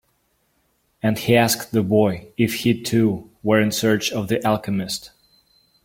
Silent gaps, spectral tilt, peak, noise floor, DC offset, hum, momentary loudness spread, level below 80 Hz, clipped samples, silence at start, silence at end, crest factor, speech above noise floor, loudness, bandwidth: none; -5 dB/octave; -2 dBFS; -66 dBFS; under 0.1%; none; 8 LU; -54 dBFS; under 0.1%; 1.05 s; 0.75 s; 20 dB; 47 dB; -20 LUFS; 17 kHz